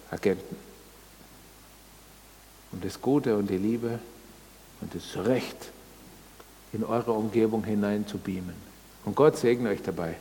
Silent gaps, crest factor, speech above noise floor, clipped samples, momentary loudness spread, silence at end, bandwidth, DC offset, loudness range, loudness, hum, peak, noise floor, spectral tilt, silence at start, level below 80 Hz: none; 22 dB; 25 dB; under 0.1%; 24 LU; 0 s; 19 kHz; under 0.1%; 6 LU; -28 LUFS; none; -8 dBFS; -52 dBFS; -6.5 dB/octave; 0 s; -58 dBFS